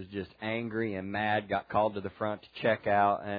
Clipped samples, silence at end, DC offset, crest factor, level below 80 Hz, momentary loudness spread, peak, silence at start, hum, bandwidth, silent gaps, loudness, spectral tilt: under 0.1%; 0 s; under 0.1%; 18 dB; -64 dBFS; 9 LU; -12 dBFS; 0 s; none; 5 kHz; none; -31 LUFS; -9 dB/octave